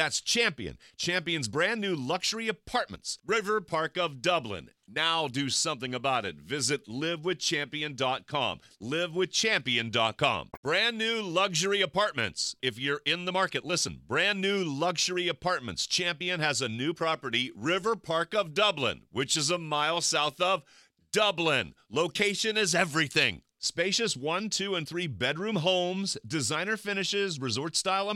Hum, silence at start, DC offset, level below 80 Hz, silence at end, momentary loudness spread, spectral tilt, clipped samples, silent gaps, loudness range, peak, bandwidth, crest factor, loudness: none; 0 s; under 0.1%; -64 dBFS; 0 s; 6 LU; -2.5 dB/octave; under 0.1%; 10.57-10.63 s; 3 LU; -10 dBFS; 16.5 kHz; 20 dB; -28 LUFS